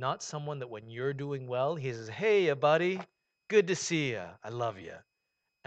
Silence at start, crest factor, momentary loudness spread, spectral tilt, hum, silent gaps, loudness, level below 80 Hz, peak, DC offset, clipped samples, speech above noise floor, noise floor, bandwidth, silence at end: 0 s; 20 dB; 14 LU; -5 dB/octave; none; none; -31 LUFS; -76 dBFS; -12 dBFS; under 0.1%; under 0.1%; 52 dB; -83 dBFS; 8.8 kHz; 0.65 s